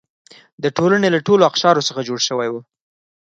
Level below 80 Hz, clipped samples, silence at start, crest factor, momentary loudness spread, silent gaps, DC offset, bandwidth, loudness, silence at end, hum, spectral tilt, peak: -64 dBFS; under 0.1%; 0.6 s; 18 dB; 10 LU; none; under 0.1%; 8 kHz; -17 LUFS; 0.6 s; none; -4 dB/octave; 0 dBFS